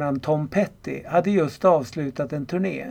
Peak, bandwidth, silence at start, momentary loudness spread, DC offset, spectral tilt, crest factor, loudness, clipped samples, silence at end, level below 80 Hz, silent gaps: -6 dBFS; 16 kHz; 0 s; 9 LU; under 0.1%; -7.5 dB/octave; 18 dB; -23 LUFS; under 0.1%; 0 s; -56 dBFS; none